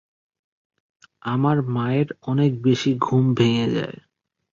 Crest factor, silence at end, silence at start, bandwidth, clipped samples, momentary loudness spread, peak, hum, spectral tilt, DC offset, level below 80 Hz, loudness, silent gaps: 18 dB; 0.6 s; 1.25 s; 7.6 kHz; under 0.1%; 8 LU; -4 dBFS; none; -7.5 dB/octave; under 0.1%; -58 dBFS; -21 LUFS; none